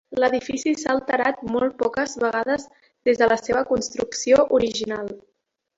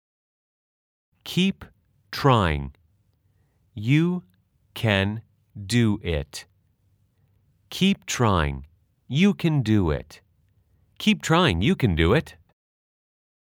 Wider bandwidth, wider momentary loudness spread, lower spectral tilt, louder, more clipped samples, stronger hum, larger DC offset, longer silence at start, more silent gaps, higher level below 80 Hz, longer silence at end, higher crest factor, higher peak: second, 8 kHz vs 18 kHz; second, 9 LU vs 18 LU; second, -3.5 dB/octave vs -6 dB/octave; about the same, -22 LUFS vs -23 LUFS; neither; neither; neither; second, 0.1 s vs 1.25 s; neither; second, -54 dBFS vs -44 dBFS; second, 0.6 s vs 1.1 s; about the same, 18 dB vs 22 dB; about the same, -4 dBFS vs -4 dBFS